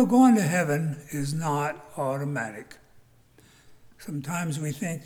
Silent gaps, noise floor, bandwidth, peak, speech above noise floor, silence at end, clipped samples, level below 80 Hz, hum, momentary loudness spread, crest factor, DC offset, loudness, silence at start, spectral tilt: none; -58 dBFS; 19.5 kHz; -8 dBFS; 32 dB; 0 s; under 0.1%; -64 dBFS; none; 17 LU; 18 dB; under 0.1%; -26 LUFS; 0 s; -6 dB/octave